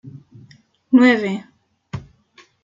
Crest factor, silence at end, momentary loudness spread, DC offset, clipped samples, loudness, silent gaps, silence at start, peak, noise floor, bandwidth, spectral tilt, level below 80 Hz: 18 dB; 0.65 s; 22 LU; under 0.1%; under 0.1%; -16 LUFS; none; 0.05 s; -2 dBFS; -53 dBFS; 7.6 kHz; -6.5 dB/octave; -58 dBFS